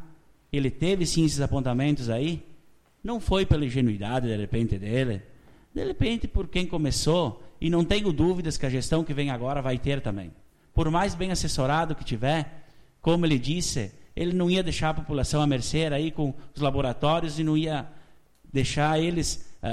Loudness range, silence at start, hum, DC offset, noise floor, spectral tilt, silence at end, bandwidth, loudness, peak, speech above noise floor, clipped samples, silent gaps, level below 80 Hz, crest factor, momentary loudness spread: 2 LU; 0 s; none; under 0.1%; -55 dBFS; -5.5 dB/octave; 0 s; 14.5 kHz; -27 LUFS; -10 dBFS; 30 dB; under 0.1%; none; -38 dBFS; 16 dB; 8 LU